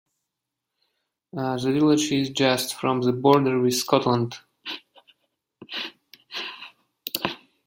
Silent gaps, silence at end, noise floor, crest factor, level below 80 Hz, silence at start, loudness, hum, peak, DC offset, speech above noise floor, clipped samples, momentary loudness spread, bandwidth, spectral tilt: none; 0.3 s; -84 dBFS; 24 dB; -64 dBFS; 1.35 s; -23 LUFS; none; -2 dBFS; under 0.1%; 62 dB; under 0.1%; 17 LU; 16.5 kHz; -4.5 dB/octave